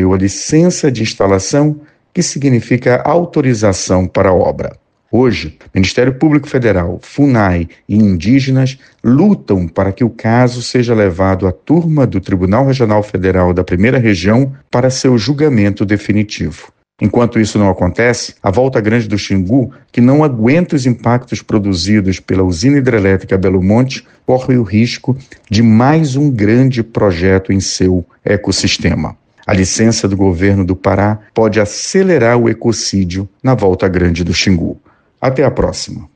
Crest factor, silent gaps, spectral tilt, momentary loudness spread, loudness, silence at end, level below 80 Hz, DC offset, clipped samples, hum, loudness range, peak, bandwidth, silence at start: 12 dB; none; -6 dB/octave; 6 LU; -12 LUFS; 0.1 s; -36 dBFS; under 0.1%; under 0.1%; none; 2 LU; 0 dBFS; 9.6 kHz; 0 s